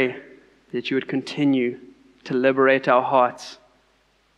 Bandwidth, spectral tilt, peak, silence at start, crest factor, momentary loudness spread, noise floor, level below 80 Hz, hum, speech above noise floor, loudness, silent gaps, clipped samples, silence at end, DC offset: 9.4 kHz; -6 dB/octave; -4 dBFS; 0 s; 18 dB; 22 LU; -63 dBFS; -70 dBFS; none; 42 dB; -21 LUFS; none; under 0.1%; 0.8 s; under 0.1%